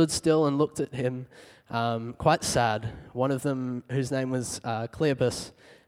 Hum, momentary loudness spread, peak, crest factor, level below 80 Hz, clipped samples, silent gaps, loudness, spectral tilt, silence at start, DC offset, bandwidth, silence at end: none; 11 LU; -6 dBFS; 22 dB; -54 dBFS; under 0.1%; none; -28 LUFS; -5 dB/octave; 0 s; under 0.1%; 16 kHz; 0.15 s